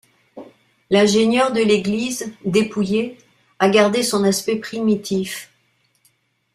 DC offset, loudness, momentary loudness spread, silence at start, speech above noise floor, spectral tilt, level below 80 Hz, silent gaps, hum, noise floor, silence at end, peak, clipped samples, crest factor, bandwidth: under 0.1%; -18 LUFS; 9 LU; 0.35 s; 46 dB; -4.5 dB/octave; -58 dBFS; none; none; -63 dBFS; 1.1 s; -2 dBFS; under 0.1%; 18 dB; 15 kHz